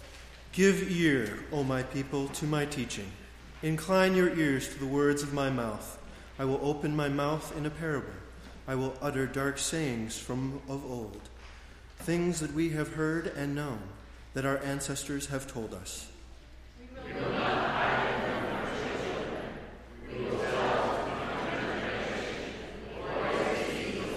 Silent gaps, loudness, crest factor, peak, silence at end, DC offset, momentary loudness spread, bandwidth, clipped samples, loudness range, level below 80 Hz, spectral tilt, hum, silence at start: none; -32 LUFS; 20 dB; -12 dBFS; 0 s; under 0.1%; 18 LU; 15.5 kHz; under 0.1%; 5 LU; -50 dBFS; -5 dB/octave; none; 0 s